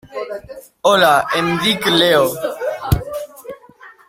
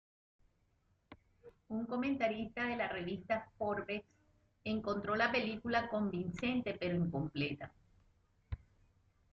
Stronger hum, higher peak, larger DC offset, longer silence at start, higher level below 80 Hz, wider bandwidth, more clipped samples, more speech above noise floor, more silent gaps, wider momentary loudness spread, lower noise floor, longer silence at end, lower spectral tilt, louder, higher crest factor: neither; first, 0 dBFS vs -20 dBFS; neither; second, 0.05 s vs 1.1 s; first, -36 dBFS vs -62 dBFS; first, 16.5 kHz vs 7.4 kHz; neither; second, 29 dB vs 38 dB; neither; first, 18 LU vs 12 LU; second, -43 dBFS vs -76 dBFS; second, 0.15 s vs 0.75 s; second, -4 dB/octave vs -7 dB/octave; first, -15 LUFS vs -38 LUFS; about the same, 16 dB vs 20 dB